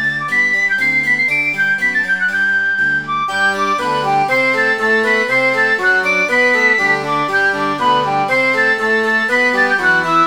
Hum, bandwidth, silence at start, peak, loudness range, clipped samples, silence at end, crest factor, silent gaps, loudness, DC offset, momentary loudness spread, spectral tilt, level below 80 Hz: none; over 20 kHz; 0 s; -2 dBFS; 2 LU; under 0.1%; 0 s; 12 dB; none; -13 LUFS; 0.5%; 3 LU; -3.5 dB/octave; -56 dBFS